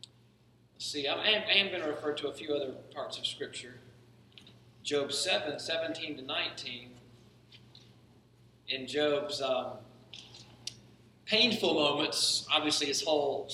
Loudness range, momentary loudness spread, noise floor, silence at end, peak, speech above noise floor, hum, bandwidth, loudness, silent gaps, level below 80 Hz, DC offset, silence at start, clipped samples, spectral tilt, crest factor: 8 LU; 18 LU; -64 dBFS; 0 s; -8 dBFS; 32 dB; none; 16 kHz; -31 LUFS; none; -72 dBFS; under 0.1%; 0.8 s; under 0.1%; -2 dB/octave; 26 dB